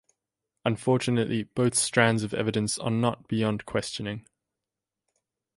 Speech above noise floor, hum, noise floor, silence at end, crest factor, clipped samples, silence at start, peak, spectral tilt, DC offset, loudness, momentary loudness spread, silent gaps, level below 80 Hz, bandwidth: 62 dB; none; -88 dBFS; 1.35 s; 22 dB; under 0.1%; 0.65 s; -6 dBFS; -4.5 dB/octave; under 0.1%; -27 LUFS; 9 LU; none; -60 dBFS; 11.5 kHz